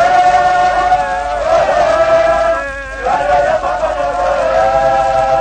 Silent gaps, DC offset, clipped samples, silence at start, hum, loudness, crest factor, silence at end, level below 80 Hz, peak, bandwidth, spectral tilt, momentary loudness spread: none; under 0.1%; under 0.1%; 0 s; none; -12 LUFS; 10 dB; 0 s; -32 dBFS; -2 dBFS; 9.4 kHz; -4 dB/octave; 6 LU